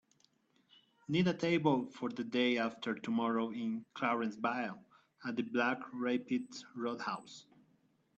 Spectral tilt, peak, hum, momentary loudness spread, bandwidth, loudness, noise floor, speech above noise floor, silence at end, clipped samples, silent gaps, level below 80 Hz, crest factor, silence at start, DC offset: -6 dB/octave; -18 dBFS; none; 12 LU; 8.4 kHz; -36 LUFS; -73 dBFS; 37 dB; 0.75 s; under 0.1%; none; -78 dBFS; 18 dB; 1.1 s; under 0.1%